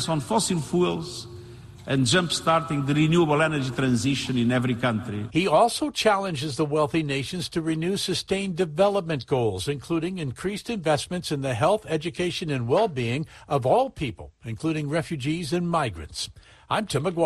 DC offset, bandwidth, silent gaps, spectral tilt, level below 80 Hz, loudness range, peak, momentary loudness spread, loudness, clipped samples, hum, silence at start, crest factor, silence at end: under 0.1%; 12.5 kHz; none; -5 dB/octave; -52 dBFS; 4 LU; -8 dBFS; 10 LU; -25 LUFS; under 0.1%; none; 0 s; 18 dB; 0 s